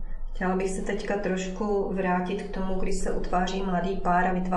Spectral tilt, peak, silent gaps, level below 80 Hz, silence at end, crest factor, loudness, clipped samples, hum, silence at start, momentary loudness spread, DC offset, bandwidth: -6 dB/octave; -12 dBFS; none; -36 dBFS; 0 s; 14 dB; -28 LUFS; under 0.1%; none; 0 s; 7 LU; under 0.1%; 11.5 kHz